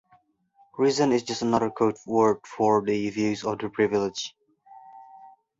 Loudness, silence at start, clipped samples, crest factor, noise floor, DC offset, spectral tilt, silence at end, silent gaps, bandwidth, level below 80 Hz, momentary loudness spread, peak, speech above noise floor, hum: -25 LUFS; 0.75 s; under 0.1%; 18 dB; -63 dBFS; under 0.1%; -5 dB/octave; 0.3 s; none; 7.8 kHz; -64 dBFS; 8 LU; -8 dBFS; 39 dB; none